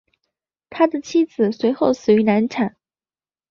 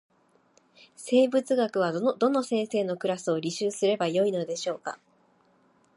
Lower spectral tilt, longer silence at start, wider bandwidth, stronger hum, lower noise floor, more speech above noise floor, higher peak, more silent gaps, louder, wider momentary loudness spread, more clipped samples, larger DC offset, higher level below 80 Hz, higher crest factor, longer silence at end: first, -6.5 dB/octave vs -5 dB/octave; second, 0.7 s vs 1 s; second, 7.2 kHz vs 11.5 kHz; neither; first, under -90 dBFS vs -64 dBFS; first, over 72 dB vs 38 dB; first, -4 dBFS vs -10 dBFS; neither; first, -19 LUFS vs -27 LUFS; about the same, 8 LU vs 9 LU; neither; neither; first, -62 dBFS vs -82 dBFS; about the same, 16 dB vs 18 dB; second, 0.8 s vs 1 s